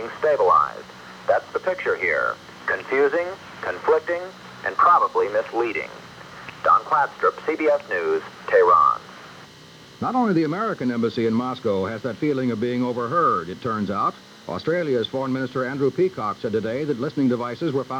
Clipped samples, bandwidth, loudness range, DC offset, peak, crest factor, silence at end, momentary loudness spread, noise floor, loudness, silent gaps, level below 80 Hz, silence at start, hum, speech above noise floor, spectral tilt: under 0.1%; 11 kHz; 4 LU; under 0.1%; -6 dBFS; 16 dB; 0 s; 13 LU; -45 dBFS; -22 LUFS; none; -62 dBFS; 0 s; none; 24 dB; -6.5 dB/octave